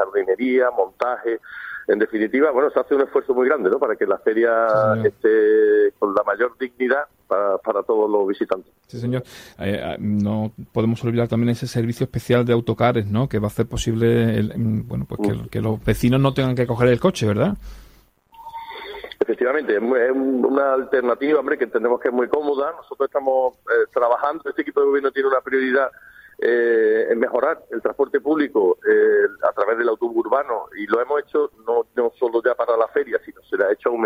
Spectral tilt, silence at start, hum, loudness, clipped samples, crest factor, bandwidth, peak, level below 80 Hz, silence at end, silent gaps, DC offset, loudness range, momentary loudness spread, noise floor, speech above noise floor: -7 dB/octave; 0 s; none; -20 LUFS; under 0.1%; 16 dB; 15.5 kHz; -4 dBFS; -48 dBFS; 0 s; none; under 0.1%; 4 LU; 9 LU; -52 dBFS; 33 dB